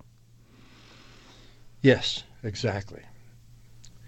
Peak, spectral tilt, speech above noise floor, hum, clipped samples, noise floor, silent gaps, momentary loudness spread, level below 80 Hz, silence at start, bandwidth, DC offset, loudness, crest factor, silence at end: -6 dBFS; -5.5 dB/octave; 30 dB; none; under 0.1%; -55 dBFS; none; 20 LU; -56 dBFS; 1.85 s; 8.6 kHz; under 0.1%; -26 LUFS; 26 dB; 0 s